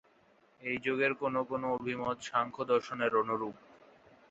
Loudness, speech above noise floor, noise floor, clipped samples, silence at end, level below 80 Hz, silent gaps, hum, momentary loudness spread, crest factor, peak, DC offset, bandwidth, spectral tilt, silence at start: -33 LUFS; 33 dB; -66 dBFS; under 0.1%; 0.8 s; -72 dBFS; none; none; 6 LU; 20 dB; -16 dBFS; under 0.1%; 8 kHz; -3.5 dB/octave; 0.6 s